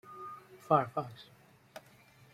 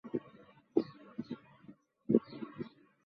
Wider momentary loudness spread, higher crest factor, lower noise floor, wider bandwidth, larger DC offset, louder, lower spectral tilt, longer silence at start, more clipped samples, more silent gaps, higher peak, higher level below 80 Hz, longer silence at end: about the same, 24 LU vs 24 LU; about the same, 26 dB vs 28 dB; about the same, -61 dBFS vs -60 dBFS; first, 16 kHz vs 5.8 kHz; neither; first, -32 LUFS vs -38 LUFS; about the same, -7 dB/octave vs -8 dB/octave; about the same, 0.05 s vs 0.05 s; neither; neither; about the same, -12 dBFS vs -12 dBFS; about the same, -76 dBFS vs -78 dBFS; first, 0.55 s vs 0.4 s